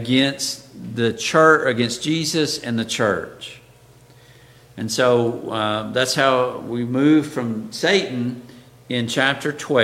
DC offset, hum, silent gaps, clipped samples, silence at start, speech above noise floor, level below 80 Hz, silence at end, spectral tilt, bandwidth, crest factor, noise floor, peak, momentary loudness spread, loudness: under 0.1%; none; none; under 0.1%; 0 s; 29 dB; -60 dBFS; 0 s; -4 dB/octave; 16 kHz; 20 dB; -49 dBFS; 0 dBFS; 10 LU; -20 LUFS